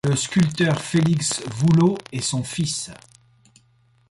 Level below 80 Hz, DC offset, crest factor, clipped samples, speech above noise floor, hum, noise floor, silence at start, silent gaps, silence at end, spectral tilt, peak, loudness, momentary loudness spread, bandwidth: -54 dBFS; under 0.1%; 14 dB; under 0.1%; 39 dB; none; -60 dBFS; 0.05 s; none; 1.15 s; -5 dB/octave; -8 dBFS; -21 LUFS; 8 LU; 11.5 kHz